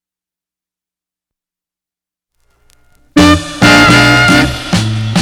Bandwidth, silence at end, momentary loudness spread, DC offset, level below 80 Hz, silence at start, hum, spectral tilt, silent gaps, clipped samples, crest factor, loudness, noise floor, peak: 19 kHz; 0 s; 9 LU; under 0.1%; -30 dBFS; 3.15 s; none; -4.5 dB/octave; none; 0.9%; 12 dB; -8 LUFS; -88 dBFS; 0 dBFS